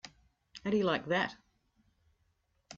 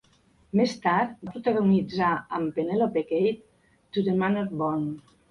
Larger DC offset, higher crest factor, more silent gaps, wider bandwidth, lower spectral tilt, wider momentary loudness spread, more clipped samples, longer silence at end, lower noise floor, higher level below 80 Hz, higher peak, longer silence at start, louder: neither; about the same, 20 dB vs 16 dB; neither; about the same, 7.6 kHz vs 7.2 kHz; second, -3.5 dB/octave vs -7.5 dB/octave; first, 11 LU vs 8 LU; neither; second, 0 s vs 0.3 s; first, -76 dBFS vs -62 dBFS; second, -68 dBFS vs -62 dBFS; second, -18 dBFS vs -10 dBFS; second, 0.05 s vs 0.55 s; second, -33 LUFS vs -26 LUFS